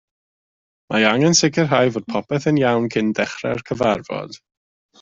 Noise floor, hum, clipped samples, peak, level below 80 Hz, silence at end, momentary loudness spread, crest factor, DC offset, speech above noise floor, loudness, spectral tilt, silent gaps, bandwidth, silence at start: under -90 dBFS; none; under 0.1%; -2 dBFS; -56 dBFS; 0.65 s; 11 LU; 18 dB; under 0.1%; over 71 dB; -18 LUFS; -4.5 dB/octave; none; 7.8 kHz; 0.9 s